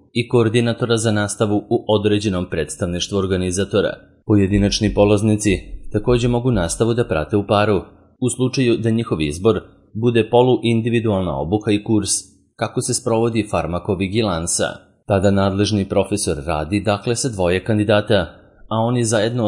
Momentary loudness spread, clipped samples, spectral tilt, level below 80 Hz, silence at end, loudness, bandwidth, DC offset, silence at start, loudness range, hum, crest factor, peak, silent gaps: 7 LU; under 0.1%; -5.5 dB/octave; -38 dBFS; 0 s; -18 LUFS; 11.5 kHz; under 0.1%; 0.15 s; 2 LU; none; 18 dB; 0 dBFS; none